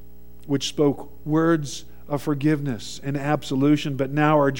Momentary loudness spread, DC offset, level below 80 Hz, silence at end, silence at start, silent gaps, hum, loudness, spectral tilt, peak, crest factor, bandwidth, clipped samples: 10 LU; 1%; -52 dBFS; 0 s; 0.45 s; none; none; -23 LUFS; -6 dB/octave; -4 dBFS; 18 dB; 16.5 kHz; under 0.1%